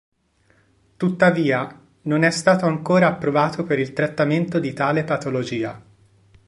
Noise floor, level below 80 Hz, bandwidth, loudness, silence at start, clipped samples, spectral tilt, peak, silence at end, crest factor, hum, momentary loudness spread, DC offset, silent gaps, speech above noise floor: -61 dBFS; -60 dBFS; 11.5 kHz; -20 LUFS; 1 s; under 0.1%; -6 dB/octave; -2 dBFS; 0.7 s; 20 dB; none; 8 LU; under 0.1%; none; 41 dB